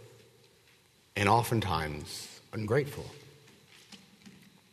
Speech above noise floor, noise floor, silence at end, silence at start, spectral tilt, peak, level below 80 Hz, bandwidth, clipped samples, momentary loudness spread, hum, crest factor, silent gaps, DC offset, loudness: 33 dB; -64 dBFS; 0.45 s; 0 s; -5.5 dB/octave; -10 dBFS; -58 dBFS; 13.5 kHz; under 0.1%; 26 LU; none; 24 dB; none; under 0.1%; -31 LUFS